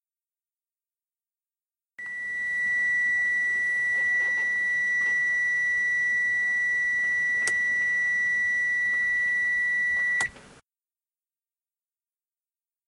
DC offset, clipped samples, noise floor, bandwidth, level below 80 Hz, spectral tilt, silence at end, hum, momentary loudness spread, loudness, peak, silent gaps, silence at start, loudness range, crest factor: under 0.1%; under 0.1%; under -90 dBFS; 11.5 kHz; -64 dBFS; -0.5 dB/octave; 2.45 s; none; 3 LU; -23 LUFS; -10 dBFS; none; 2 s; 5 LU; 16 dB